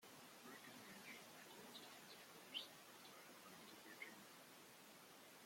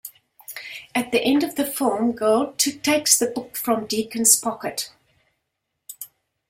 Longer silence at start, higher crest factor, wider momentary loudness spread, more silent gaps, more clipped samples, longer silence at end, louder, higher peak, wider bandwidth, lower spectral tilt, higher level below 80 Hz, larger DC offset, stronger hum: about the same, 0 s vs 0.05 s; about the same, 24 dB vs 24 dB; second, 10 LU vs 21 LU; neither; neither; second, 0 s vs 0.45 s; second, -58 LUFS vs -20 LUFS; second, -36 dBFS vs 0 dBFS; about the same, 16.5 kHz vs 16.5 kHz; about the same, -1.5 dB/octave vs -1.5 dB/octave; second, under -90 dBFS vs -64 dBFS; neither; neither